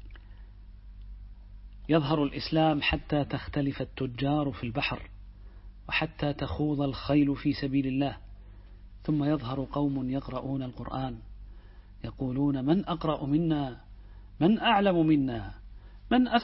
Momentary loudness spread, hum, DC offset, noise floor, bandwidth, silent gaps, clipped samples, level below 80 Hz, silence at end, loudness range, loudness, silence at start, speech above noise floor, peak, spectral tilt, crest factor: 19 LU; none; under 0.1%; -49 dBFS; 5.8 kHz; none; under 0.1%; -46 dBFS; 0 s; 5 LU; -29 LUFS; 0 s; 21 dB; -10 dBFS; -10.5 dB/octave; 20 dB